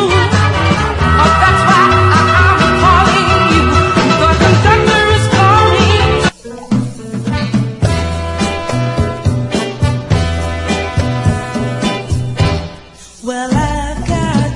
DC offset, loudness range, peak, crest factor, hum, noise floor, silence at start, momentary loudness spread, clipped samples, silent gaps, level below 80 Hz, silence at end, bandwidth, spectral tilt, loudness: under 0.1%; 8 LU; 0 dBFS; 12 dB; none; -35 dBFS; 0 s; 10 LU; under 0.1%; none; -26 dBFS; 0 s; 11.5 kHz; -5.5 dB/octave; -12 LUFS